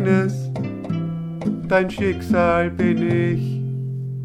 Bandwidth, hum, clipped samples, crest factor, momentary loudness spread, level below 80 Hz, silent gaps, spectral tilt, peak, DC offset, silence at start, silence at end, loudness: 10.5 kHz; none; under 0.1%; 16 dB; 8 LU; -46 dBFS; none; -8 dB/octave; -4 dBFS; under 0.1%; 0 s; 0 s; -21 LUFS